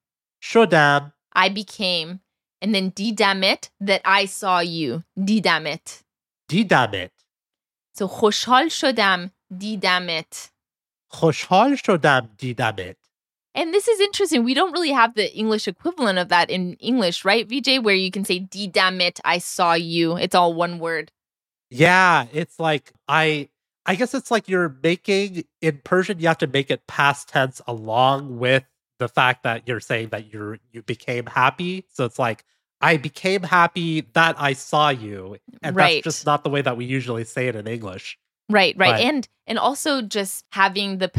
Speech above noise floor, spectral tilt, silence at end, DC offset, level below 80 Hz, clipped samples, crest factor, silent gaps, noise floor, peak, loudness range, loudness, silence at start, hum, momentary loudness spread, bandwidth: over 70 dB; -4.5 dB/octave; 0 s; under 0.1%; -68 dBFS; under 0.1%; 20 dB; none; under -90 dBFS; -2 dBFS; 3 LU; -20 LUFS; 0.4 s; none; 13 LU; 15.5 kHz